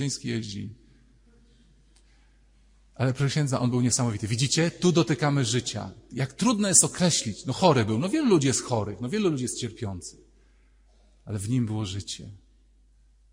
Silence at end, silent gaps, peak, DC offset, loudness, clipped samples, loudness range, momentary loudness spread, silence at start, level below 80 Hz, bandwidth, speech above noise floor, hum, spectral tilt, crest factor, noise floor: 0.95 s; none; -4 dBFS; under 0.1%; -25 LUFS; under 0.1%; 11 LU; 15 LU; 0 s; -58 dBFS; 16 kHz; 33 dB; none; -4.5 dB/octave; 24 dB; -59 dBFS